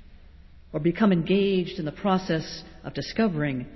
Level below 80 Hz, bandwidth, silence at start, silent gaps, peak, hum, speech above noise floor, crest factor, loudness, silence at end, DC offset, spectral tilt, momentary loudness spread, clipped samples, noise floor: -50 dBFS; 6 kHz; 0 s; none; -10 dBFS; none; 23 dB; 16 dB; -25 LUFS; 0 s; under 0.1%; -7 dB/octave; 14 LU; under 0.1%; -49 dBFS